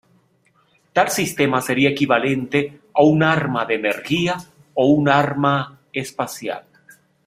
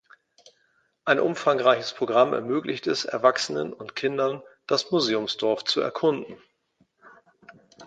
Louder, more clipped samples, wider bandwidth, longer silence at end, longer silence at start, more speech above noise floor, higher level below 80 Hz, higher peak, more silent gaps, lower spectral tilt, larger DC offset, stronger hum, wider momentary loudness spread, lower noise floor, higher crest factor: first, -19 LUFS vs -24 LUFS; neither; first, 16 kHz vs 9.2 kHz; first, 0.65 s vs 0 s; about the same, 0.95 s vs 1.05 s; about the same, 42 dB vs 44 dB; first, -58 dBFS vs -72 dBFS; first, 0 dBFS vs -4 dBFS; neither; about the same, -5 dB/octave vs -4 dB/octave; neither; neither; first, 13 LU vs 9 LU; second, -60 dBFS vs -68 dBFS; about the same, 20 dB vs 22 dB